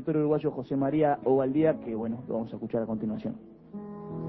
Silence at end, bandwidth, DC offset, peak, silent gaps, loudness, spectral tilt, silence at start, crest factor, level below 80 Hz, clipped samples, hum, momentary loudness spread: 0 s; 5 kHz; under 0.1%; -12 dBFS; none; -29 LUFS; -11.5 dB/octave; 0 s; 16 dB; -62 dBFS; under 0.1%; none; 16 LU